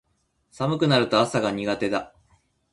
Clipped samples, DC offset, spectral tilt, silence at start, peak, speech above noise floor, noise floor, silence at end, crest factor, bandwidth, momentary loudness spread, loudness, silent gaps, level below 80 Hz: under 0.1%; under 0.1%; -5.5 dB/octave; 0.6 s; -6 dBFS; 47 dB; -69 dBFS; 0.65 s; 20 dB; 11.5 kHz; 9 LU; -23 LUFS; none; -60 dBFS